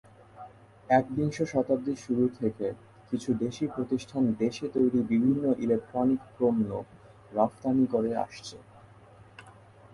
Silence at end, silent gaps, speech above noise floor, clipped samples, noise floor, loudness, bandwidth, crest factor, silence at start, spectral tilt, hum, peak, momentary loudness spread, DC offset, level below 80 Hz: 0.4 s; none; 26 dB; under 0.1%; -54 dBFS; -28 LUFS; 11.5 kHz; 18 dB; 0.35 s; -7.5 dB/octave; none; -10 dBFS; 12 LU; under 0.1%; -62 dBFS